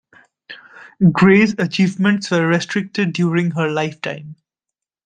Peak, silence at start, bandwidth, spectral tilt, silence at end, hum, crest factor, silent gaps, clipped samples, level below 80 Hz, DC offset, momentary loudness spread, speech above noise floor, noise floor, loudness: -2 dBFS; 0.5 s; 9.2 kHz; -6.5 dB/octave; 0.7 s; none; 16 dB; none; under 0.1%; -56 dBFS; under 0.1%; 15 LU; 68 dB; -84 dBFS; -17 LUFS